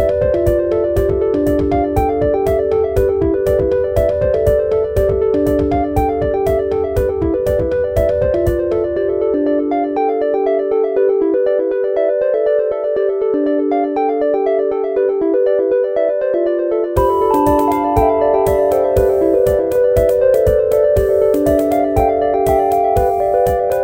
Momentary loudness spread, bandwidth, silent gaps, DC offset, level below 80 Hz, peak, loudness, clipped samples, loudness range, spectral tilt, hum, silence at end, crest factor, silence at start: 3 LU; 17 kHz; none; under 0.1%; -30 dBFS; 0 dBFS; -15 LUFS; under 0.1%; 3 LU; -8 dB/octave; none; 0 s; 14 dB; 0 s